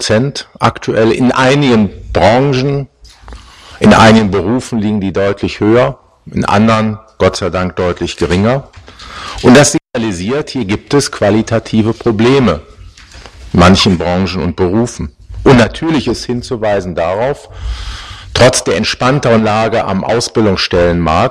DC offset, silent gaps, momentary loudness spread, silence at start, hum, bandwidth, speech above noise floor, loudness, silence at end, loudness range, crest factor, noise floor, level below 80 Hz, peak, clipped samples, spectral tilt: under 0.1%; none; 11 LU; 0 s; none; 14.5 kHz; 24 dB; -11 LUFS; 0 s; 3 LU; 12 dB; -35 dBFS; -32 dBFS; 0 dBFS; under 0.1%; -5.5 dB/octave